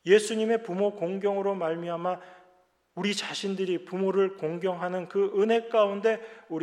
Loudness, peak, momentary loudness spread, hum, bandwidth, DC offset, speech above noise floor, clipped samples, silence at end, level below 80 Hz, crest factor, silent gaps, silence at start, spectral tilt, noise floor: -28 LUFS; -8 dBFS; 8 LU; none; 12 kHz; under 0.1%; 37 dB; under 0.1%; 0 s; -84 dBFS; 20 dB; none; 0.05 s; -5 dB/octave; -64 dBFS